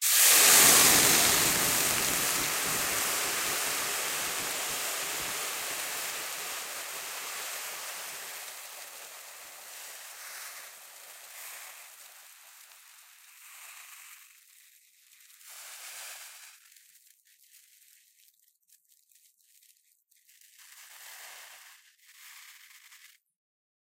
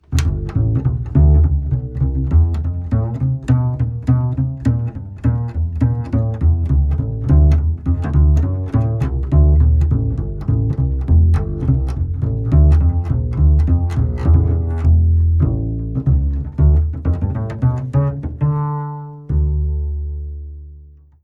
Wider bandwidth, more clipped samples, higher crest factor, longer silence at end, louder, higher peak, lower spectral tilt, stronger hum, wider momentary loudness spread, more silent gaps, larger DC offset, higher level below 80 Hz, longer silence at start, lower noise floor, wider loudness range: first, 16 kHz vs 7 kHz; neither; first, 28 dB vs 14 dB; first, 0.85 s vs 0.35 s; second, -25 LUFS vs -17 LUFS; about the same, -4 dBFS vs -2 dBFS; second, 0.5 dB/octave vs -9.5 dB/octave; neither; first, 28 LU vs 8 LU; neither; neither; second, -64 dBFS vs -20 dBFS; about the same, 0 s vs 0.1 s; first, -68 dBFS vs -41 dBFS; first, 25 LU vs 3 LU